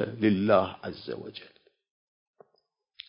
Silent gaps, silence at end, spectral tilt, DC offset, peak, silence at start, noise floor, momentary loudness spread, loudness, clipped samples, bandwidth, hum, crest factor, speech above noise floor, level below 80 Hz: none; 1.65 s; -10.5 dB/octave; under 0.1%; -8 dBFS; 0 s; -75 dBFS; 19 LU; -27 LUFS; under 0.1%; 5.4 kHz; none; 22 dB; 47 dB; -62 dBFS